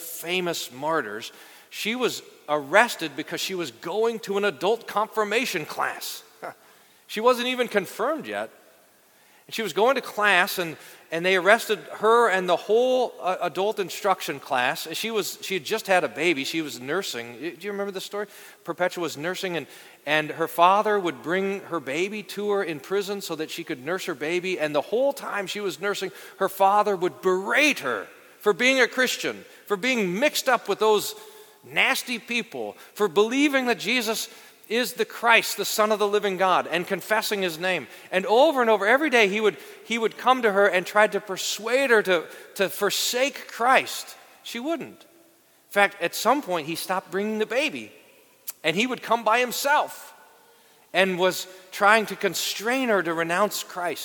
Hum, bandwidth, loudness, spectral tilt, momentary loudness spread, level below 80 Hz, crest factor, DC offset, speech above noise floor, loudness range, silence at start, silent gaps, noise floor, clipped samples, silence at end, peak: none; 19 kHz; -24 LUFS; -3 dB/octave; 13 LU; -80 dBFS; 24 dB; under 0.1%; 34 dB; 6 LU; 0 s; none; -58 dBFS; under 0.1%; 0 s; 0 dBFS